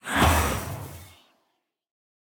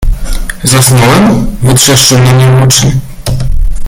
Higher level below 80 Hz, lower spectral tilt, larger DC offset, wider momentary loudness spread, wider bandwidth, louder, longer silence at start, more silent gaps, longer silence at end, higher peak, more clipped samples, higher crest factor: second, -38 dBFS vs -14 dBFS; about the same, -4 dB/octave vs -4 dB/octave; neither; first, 21 LU vs 12 LU; about the same, 19.5 kHz vs over 20 kHz; second, -24 LUFS vs -6 LUFS; about the same, 0.05 s vs 0 s; neither; first, 1.2 s vs 0 s; second, -6 dBFS vs 0 dBFS; second, under 0.1% vs 0.6%; first, 22 dB vs 6 dB